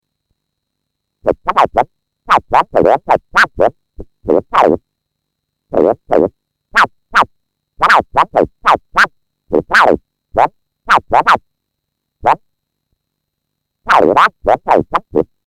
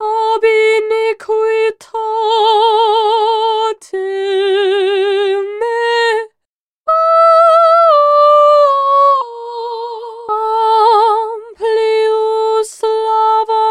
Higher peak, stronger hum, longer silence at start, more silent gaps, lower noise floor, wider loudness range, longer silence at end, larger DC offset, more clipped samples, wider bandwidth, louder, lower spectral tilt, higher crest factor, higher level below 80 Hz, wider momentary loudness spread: about the same, 0 dBFS vs 0 dBFS; neither; first, 1.25 s vs 0 s; second, none vs 6.45-6.84 s; second, -74 dBFS vs -78 dBFS; about the same, 3 LU vs 5 LU; first, 0.25 s vs 0 s; neither; neither; first, 16.5 kHz vs 11 kHz; about the same, -13 LUFS vs -12 LUFS; first, -5 dB/octave vs -1 dB/octave; about the same, 14 dB vs 12 dB; first, -40 dBFS vs -68 dBFS; second, 8 LU vs 13 LU